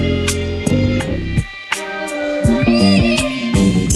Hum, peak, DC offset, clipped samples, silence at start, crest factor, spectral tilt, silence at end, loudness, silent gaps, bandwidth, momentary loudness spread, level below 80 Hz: none; 0 dBFS; under 0.1%; under 0.1%; 0 s; 14 dB; -5.5 dB/octave; 0 s; -16 LUFS; none; 13 kHz; 9 LU; -28 dBFS